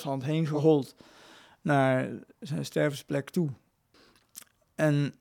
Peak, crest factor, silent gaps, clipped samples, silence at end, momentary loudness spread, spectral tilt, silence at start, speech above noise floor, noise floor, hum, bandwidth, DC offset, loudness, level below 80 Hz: -10 dBFS; 18 dB; none; under 0.1%; 0.1 s; 24 LU; -7 dB/octave; 0 s; 35 dB; -63 dBFS; none; 17 kHz; under 0.1%; -28 LUFS; -72 dBFS